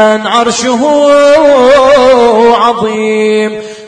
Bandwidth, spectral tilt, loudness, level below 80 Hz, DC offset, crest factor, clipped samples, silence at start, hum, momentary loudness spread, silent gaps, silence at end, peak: 10.5 kHz; -3.5 dB/octave; -7 LUFS; -42 dBFS; under 0.1%; 6 dB; 1%; 0 s; none; 6 LU; none; 0 s; 0 dBFS